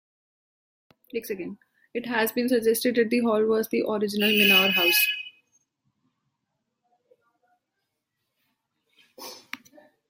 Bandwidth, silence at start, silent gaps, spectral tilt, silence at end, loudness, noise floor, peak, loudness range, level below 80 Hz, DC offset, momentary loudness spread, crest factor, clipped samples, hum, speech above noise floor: 16.5 kHz; 1.15 s; none; -3 dB/octave; 0.55 s; -22 LUFS; -81 dBFS; -8 dBFS; 7 LU; -74 dBFS; under 0.1%; 24 LU; 20 dB; under 0.1%; none; 58 dB